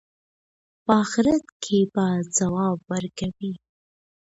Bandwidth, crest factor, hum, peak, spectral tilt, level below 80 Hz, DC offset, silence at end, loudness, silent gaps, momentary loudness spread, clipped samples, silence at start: 8 kHz; 20 dB; none; -4 dBFS; -5 dB/octave; -56 dBFS; under 0.1%; 0.75 s; -24 LUFS; 1.52-1.60 s; 12 LU; under 0.1%; 0.9 s